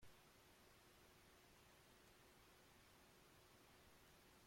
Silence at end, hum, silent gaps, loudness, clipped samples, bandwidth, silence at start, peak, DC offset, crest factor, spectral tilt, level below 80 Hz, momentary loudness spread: 0 s; none; none; -69 LUFS; under 0.1%; 16.5 kHz; 0 s; -54 dBFS; under 0.1%; 16 dB; -3 dB/octave; -80 dBFS; 0 LU